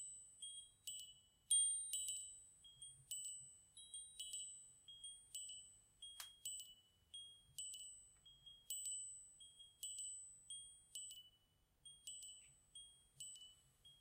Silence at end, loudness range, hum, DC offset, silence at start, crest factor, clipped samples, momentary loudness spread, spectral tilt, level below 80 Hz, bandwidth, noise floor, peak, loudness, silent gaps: 0 s; 11 LU; none; under 0.1%; 0 s; 26 dB; under 0.1%; 18 LU; 2.5 dB/octave; -84 dBFS; 16 kHz; -79 dBFS; -26 dBFS; -48 LUFS; none